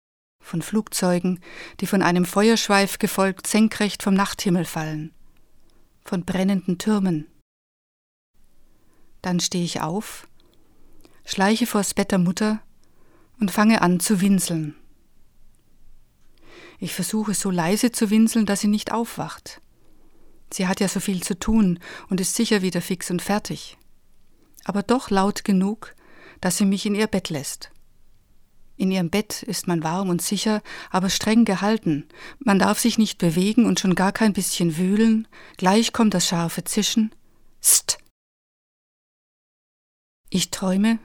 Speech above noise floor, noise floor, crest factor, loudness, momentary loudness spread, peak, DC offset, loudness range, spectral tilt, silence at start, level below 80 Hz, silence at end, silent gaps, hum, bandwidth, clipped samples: 30 dB; -52 dBFS; 20 dB; -22 LUFS; 12 LU; -2 dBFS; under 0.1%; 7 LU; -4.5 dB/octave; 0.45 s; -48 dBFS; 0.05 s; 7.42-8.34 s, 38.11-40.24 s; none; 19 kHz; under 0.1%